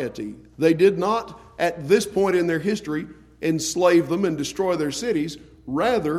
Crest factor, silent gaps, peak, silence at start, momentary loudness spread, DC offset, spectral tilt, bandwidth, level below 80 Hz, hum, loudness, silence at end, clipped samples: 18 dB; none; -4 dBFS; 0 s; 13 LU; under 0.1%; -5 dB/octave; 15.5 kHz; -54 dBFS; none; -22 LUFS; 0 s; under 0.1%